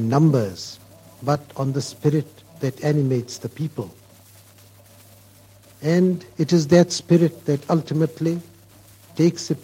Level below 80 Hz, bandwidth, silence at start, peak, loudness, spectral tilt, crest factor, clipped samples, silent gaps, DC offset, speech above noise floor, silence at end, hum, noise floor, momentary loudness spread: -62 dBFS; 16 kHz; 0 s; -2 dBFS; -21 LUFS; -6.5 dB/octave; 20 dB; under 0.1%; none; under 0.1%; 29 dB; 0.05 s; none; -50 dBFS; 15 LU